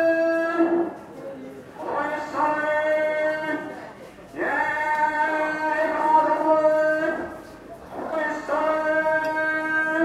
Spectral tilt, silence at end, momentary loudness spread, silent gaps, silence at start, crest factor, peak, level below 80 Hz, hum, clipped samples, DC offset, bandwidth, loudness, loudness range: -5 dB/octave; 0 s; 18 LU; none; 0 s; 16 dB; -8 dBFS; -60 dBFS; none; under 0.1%; under 0.1%; 13 kHz; -23 LUFS; 4 LU